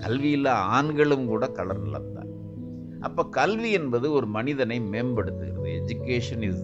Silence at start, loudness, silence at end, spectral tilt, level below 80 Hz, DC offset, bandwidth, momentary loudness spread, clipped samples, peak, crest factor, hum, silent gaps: 0 s; -26 LUFS; 0 s; -7 dB/octave; -54 dBFS; under 0.1%; 8 kHz; 14 LU; under 0.1%; -8 dBFS; 18 dB; none; none